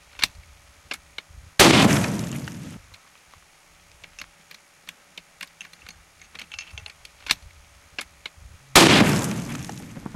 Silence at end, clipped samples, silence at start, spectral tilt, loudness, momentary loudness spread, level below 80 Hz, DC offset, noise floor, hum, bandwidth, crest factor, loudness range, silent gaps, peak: 0.05 s; under 0.1%; 0.2 s; -3.5 dB/octave; -18 LUFS; 28 LU; -48 dBFS; under 0.1%; -55 dBFS; none; 16.5 kHz; 24 dB; 22 LU; none; 0 dBFS